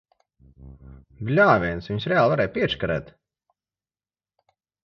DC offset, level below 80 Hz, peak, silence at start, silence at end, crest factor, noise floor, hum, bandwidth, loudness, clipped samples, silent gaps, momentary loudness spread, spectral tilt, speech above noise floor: under 0.1%; -48 dBFS; -2 dBFS; 0.6 s; 1.75 s; 22 dB; under -90 dBFS; none; 6.8 kHz; -22 LUFS; under 0.1%; none; 11 LU; -7.5 dB/octave; over 67 dB